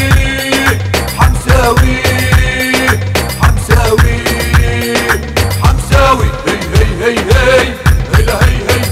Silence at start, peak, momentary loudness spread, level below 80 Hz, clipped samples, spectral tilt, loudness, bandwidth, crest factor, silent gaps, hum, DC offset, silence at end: 0 s; 0 dBFS; 4 LU; -14 dBFS; 0.6%; -5 dB/octave; -10 LUFS; 16.5 kHz; 10 dB; none; none; under 0.1%; 0 s